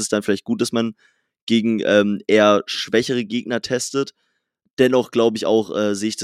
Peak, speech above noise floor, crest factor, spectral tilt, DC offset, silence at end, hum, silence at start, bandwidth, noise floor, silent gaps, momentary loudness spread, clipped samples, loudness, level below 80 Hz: -2 dBFS; 52 dB; 18 dB; -4.5 dB/octave; under 0.1%; 0 s; none; 0 s; 14.5 kHz; -71 dBFS; 1.42-1.47 s, 4.73-4.77 s; 8 LU; under 0.1%; -19 LUFS; -66 dBFS